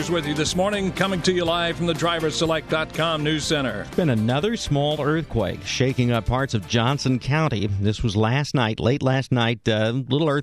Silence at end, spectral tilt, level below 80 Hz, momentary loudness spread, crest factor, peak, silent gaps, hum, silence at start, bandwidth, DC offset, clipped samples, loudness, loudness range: 0 s; -5.5 dB/octave; -42 dBFS; 3 LU; 16 dB; -6 dBFS; none; none; 0 s; 14 kHz; 0.1%; under 0.1%; -22 LUFS; 1 LU